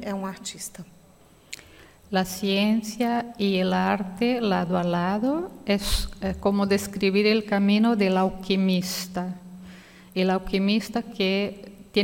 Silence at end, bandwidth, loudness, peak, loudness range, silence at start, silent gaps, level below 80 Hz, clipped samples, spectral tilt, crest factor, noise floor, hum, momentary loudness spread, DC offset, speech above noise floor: 0 s; 17 kHz; -25 LUFS; -8 dBFS; 4 LU; 0 s; none; -44 dBFS; under 0.1%; -5.5 dB/octave; 16 dB; -54 dBFS; none; 15 LU; under 0.1%; 30 dB